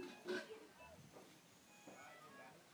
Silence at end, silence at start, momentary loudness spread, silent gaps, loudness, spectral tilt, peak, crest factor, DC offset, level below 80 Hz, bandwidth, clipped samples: 0 s; 0 s; 15 LU; none; -55 LUFS; -3.5 dB/octave; -34 dBFS; 22 dB; under 0.1%; -84 dBFS; over 20 kHz; under 0.1%